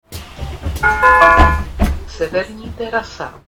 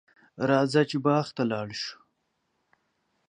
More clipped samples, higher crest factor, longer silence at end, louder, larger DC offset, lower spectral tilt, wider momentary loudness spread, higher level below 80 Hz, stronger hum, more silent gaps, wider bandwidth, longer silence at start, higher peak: neither; second, 14 dB vs 20 dB; second, 0.1 s vs 1.35 s; first, -14 LUFS vs -27 LUFS; neither; about the same, -5.5 dB/octave vs -6 dB/octave; first, 20 LU vs 11 LU; first, -22 dBFS vs -72 dBFS; neither; neither; first, 17 kHz vs 10 kHz; second, 0.1 s vs 0.4 s; first, 0 dBFS vs -10 dBFS